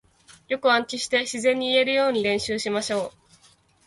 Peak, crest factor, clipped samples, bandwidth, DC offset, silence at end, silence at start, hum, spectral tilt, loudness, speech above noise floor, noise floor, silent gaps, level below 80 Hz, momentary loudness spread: -6 dBFS; 18 dB; under 0.1%; 11.5 kHz; under 0.1%; 0.75 s; 0.5 s; none; -2.5 dB/octave; -23 LUFS; 36 dB; -59 dBFS; none; -62 dBFS; 8 LU